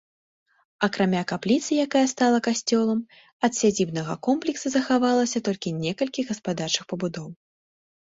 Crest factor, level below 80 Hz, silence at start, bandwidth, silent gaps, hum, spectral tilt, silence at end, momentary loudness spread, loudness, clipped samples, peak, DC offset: 18 dB; -64 dBFS; 0.8 s; 8 kHz; 3.32-3.40 s; none; -4.5 dB/octave; 0.7 s; 8 LU; -24 LUFS; under 0.1%; -6 dBFS; under 0.1%